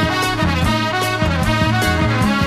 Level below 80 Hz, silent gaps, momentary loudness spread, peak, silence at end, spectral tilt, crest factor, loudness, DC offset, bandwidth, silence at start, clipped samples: -28 dBFS; none; 2 LU; -4 dBFS; 0 s; -5 dB/octave; 14 dB; -17 LUFS; 0.4%; 14 kHz; 0 s; under 0.1%